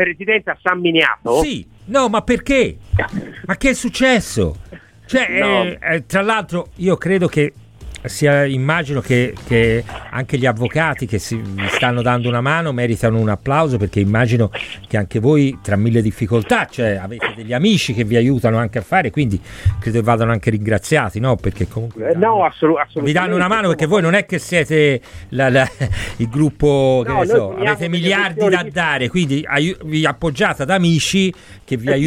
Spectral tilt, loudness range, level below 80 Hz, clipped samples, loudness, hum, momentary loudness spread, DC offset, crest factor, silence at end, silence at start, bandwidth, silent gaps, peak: -5.5 dB/octave; 2 LU; -38 dBFS; under 0.1%; -16 LUFS; none; 7 LU; under 0.1%; 16 dB; 0 s; 0 s; 15.5 kHz; none; 0 dBFS